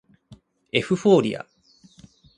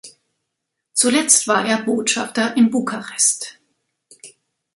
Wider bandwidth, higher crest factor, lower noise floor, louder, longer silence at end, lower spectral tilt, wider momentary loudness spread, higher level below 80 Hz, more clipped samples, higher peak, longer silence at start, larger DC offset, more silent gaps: second, 10.5 kHz vs 12 kHz; about the same, 20 dB vs 20 dB; second, -54 dBFS vs -78 dBFS; second, -21 LUFS vs -17 LUFS; first, 0.95 s vs 0.45 s; first, -6 dB/octave vs -2 dB/octave; first, 17 LU vs 10 LU; first, -62 dBFS vs -68 dBFS; neither; second, -4 dBFS vs 0 dBFS; first, 0.3 s vs 0.05 s; neither; neither